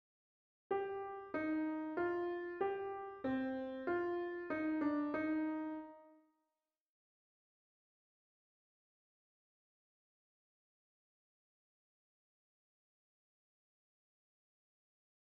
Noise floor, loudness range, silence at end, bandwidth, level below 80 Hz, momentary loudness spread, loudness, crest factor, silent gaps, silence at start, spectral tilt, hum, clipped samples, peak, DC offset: under -90 dBFS; 6 LU; 9.1 s; 5 kHz; -80 dBFS; 7 LU; -41 LUFS; 18 dB; none; 0.7 s; -4.5 dB/octave; none; under 0.1%; -26 dBFS; under 0.1%